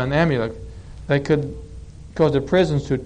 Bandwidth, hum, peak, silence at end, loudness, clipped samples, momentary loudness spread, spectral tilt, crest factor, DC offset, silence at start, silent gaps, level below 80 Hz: 9.6 kHz; none; -6 dBFS; 0 s; -20 LUFS; under 0.1%; 20 LU; -7.5 dB/octave; 16 dB; under 0.1%; 0 s; none; -38 dBFS